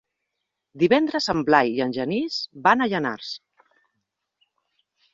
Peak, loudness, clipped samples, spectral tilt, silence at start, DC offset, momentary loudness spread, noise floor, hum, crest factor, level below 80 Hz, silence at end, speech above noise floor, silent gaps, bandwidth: -2 dBFS; -22 LUFS; under 0.1%; -5 dB/octave; 0.75 s; under 0.1%; 10 LU; -81 dBFS; none; 22 dB; -62 dBFS; 1.75 s; 59 dB; none; 7.8 kHz